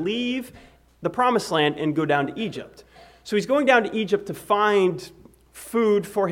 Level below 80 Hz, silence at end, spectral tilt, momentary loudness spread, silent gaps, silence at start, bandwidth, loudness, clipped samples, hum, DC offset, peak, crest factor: -60 dBFS; 0 s; -5 dB/octave; 16 LU; none; 0 s; 17 kHz; -22 LUFS; under 0.1%; none; under 0.1%; -4 dBFS; 18 dB